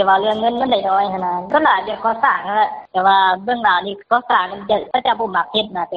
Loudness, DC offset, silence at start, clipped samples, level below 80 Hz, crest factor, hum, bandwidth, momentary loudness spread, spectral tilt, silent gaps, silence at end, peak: -17 LUFS; under 0.1%; 0 s; under 0.1%; -56 dBFS; 16 dB; none; 5.2 kHz; 5 LU; -1 dB/octave; none; 0 s; 0 dBFS